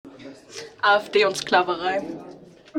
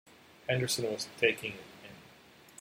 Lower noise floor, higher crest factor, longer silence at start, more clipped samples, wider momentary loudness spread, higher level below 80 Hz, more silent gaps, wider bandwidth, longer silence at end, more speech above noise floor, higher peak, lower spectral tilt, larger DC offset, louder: second, -45 dBFS vs -58 dBFS; about the same, 20 dB vs 24 dB; second, 0.05 s vs 0.45 s; neither; about the same, 20 LU vs 22 LU; first, -64 dBFS vs -72 dBFS; neither; about the same, 16 kHz vs 16 kHz; second, 0 s vs 0.55 s; about the same, 24 dB vs 25 dB; first, -4 dBFS vs -12 dBFS; about the same, -3 dB/octave vs -3.5 dB/octave; neither; first, -21 LUFS vs -32 LUFS